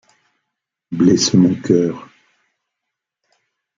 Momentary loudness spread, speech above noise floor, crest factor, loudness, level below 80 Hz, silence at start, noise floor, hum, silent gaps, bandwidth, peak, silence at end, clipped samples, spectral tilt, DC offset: 15 LU; 67 dB; 16 dB; -15 LUFS; -56 dBFS; 0.9 s; -80 dBFS; none; none; 7.6 kHz; -2 dBFS; 1.75 s; under 0.1%; -5.5 dB/octave; under 0.1%